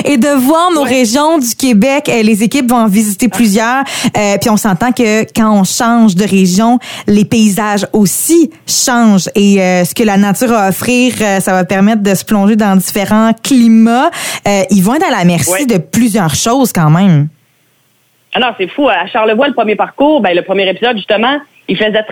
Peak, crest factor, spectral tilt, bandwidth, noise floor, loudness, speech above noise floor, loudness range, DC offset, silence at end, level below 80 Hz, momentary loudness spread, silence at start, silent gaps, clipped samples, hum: 0 dBFS; 10 dB; -4.5 dB/octave; 19 kHz; -53 dBFS; -10 LUFS; 44 dB; 2 LU; under 0.1%; 0 s; -44 dBFS; 4 LU; 0 s; none; under 0.1%; none